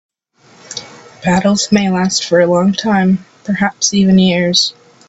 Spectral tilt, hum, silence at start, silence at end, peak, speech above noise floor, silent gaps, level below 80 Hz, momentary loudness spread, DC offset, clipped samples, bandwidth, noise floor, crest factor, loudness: -4.5 dB/octave; none; 0.7 s; 0.35 s; 0 dBFS; 36 dB; none; -48 dBFS; 11 LU; under 0.1%; under 0.1%; 8 kHz; -48 dBFS; 14 dB; -13 LUFS